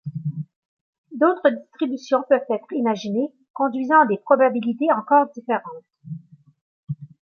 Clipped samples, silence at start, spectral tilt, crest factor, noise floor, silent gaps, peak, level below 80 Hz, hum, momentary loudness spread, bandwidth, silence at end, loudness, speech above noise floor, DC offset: under 0.1%; 0.05 s; -7.5 dB/octave; 20 dB; -39 dBFS; 0.56-1.04 s, 3.50-3.54 s, 6.61-6.87 s; -2 dBFS; -74 dBFS; none; 21 LU; 6.8 kHz; 0.35 s; -21 LUFS; 19 dB; under 0.1%